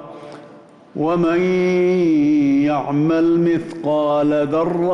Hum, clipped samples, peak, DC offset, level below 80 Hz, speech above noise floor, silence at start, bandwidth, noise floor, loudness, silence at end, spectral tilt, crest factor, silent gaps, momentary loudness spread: none; under 0.1%; -10 dBFS; under 0.1%; -54 dBFS; 27 dB; 0 s; 7 kHz; -43 dBFS; -17 LUFS; 0 s; -8 dB/octave; 8 dB; none; 8 LU